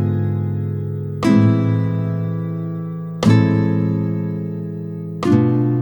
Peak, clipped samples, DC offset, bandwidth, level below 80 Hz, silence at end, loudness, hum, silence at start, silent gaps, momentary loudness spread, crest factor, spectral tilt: 0 dBFS; under 0.1%; under 0.1%; 9.2 kHz; -54 dBFS; 0 s; -19 LUFS; none; 0 s; none; 12 LU; 16 dB; -8.5 dB/octave